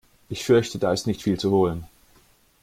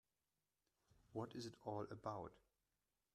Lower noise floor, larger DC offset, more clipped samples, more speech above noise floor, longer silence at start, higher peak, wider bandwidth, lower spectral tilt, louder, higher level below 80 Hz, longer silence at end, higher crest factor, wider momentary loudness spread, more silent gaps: second, -58 dBFS vs under -90 dBFS; neither; neither; second, 36 dB vs over 40 dB; second, 0.3 s vs 1.1 s; first, -6 dBFS vs -32 dBFS; first, 16 kHz vs 13.5 kHz; about the same, -6 dB/octave vs -6.5 dB/octave; first, -23 LUFS vs -52 LUFS; first, -52 dBFS vs -80 dBFS; about the same, 0.8 s vs 0.75 s; about the same, 18 dB vs 22 dB; first, 12 LU vs 5 LU; neither